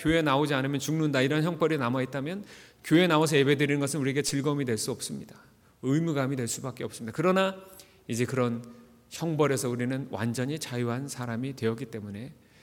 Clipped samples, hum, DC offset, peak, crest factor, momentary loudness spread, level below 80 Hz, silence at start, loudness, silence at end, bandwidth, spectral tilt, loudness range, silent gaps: under 0.1%; none; under 0.1%; -10 dBFS; 18 dB; 14 LU; -60 dBFS; 0 s; -28 LUFS; 0.3 s; 18.5 kHz; -5 dB/octave; 5 LU; none